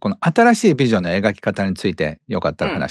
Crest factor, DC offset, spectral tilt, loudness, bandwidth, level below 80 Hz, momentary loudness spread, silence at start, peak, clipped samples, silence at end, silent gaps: 16 dB; under 0.1%; -6 dB/octave; -18 LUFS; 12.5 kHz; -48 dBFS; 9 LU; 0.05 s; -2 dBFS; under 0.1%; 0 s; none